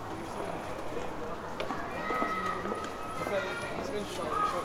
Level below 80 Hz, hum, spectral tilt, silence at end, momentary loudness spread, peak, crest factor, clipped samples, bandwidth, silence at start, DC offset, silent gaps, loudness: -54 dBFS; none; -4.5 dB/octave; 0 s; 7 LU; -14 dBFS; 20 dB; under 0.1%; 18 kHz; 0 s; under 0.1%; none; -35 LUFS